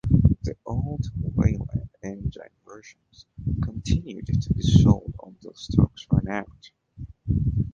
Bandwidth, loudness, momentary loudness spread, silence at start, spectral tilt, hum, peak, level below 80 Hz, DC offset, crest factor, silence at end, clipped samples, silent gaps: 7.6 kHz; -25 LUFS; 20 LU; 0.05 s; -7.5 dB/octave; none; -2 dBFS; -34 dBFS; under 0.1%; 22 dB; 0 s; under 0.1%; none